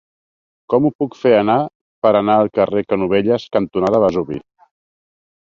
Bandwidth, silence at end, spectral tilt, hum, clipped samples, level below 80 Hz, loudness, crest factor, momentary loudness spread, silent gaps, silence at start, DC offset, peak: 7.2 kHz; 1 s; -8 dB/octave; none; under 0.1%; -52 dBFS; -16 LUFS; 16 dB; 6 LU; 0.95-0.99 s, 1.75-2.02 s; 0.7 s; under 0.1%; -2 dBFS